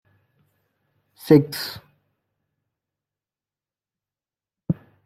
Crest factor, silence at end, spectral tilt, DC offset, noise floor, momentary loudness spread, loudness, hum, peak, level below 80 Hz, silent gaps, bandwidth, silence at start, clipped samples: 26 dB; 0.35 s; -7 dB/octave; under 0.1%; under -90 dBFS; 25 LU; -21 LUFS; none; -2 dBFS; -62 dBFS; none; 16 kHz; 1.25 s; under 0.1%